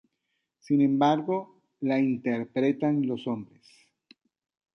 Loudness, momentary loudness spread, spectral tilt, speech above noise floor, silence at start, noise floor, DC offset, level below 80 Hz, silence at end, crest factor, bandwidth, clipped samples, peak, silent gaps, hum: -27 LUFS; 10 LU; -8 dB/octave; 54 dB; 0.7 s; -80 dBFS; under 0.1%; -74 dBFS; 1.3 s; 18 dB; 6.4 kHz; under 0.1%; -10 dBFS; none; none